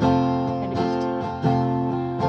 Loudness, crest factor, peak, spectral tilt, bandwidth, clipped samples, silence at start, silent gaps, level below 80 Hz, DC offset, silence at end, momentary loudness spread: -23 LUFS; 14 dB; -8 dBFS; -8.5 dB/octave; 7 kHz; under 0.1%; 0 s; none; -48 dBFS; under 0.1%; 0 s; 4 LU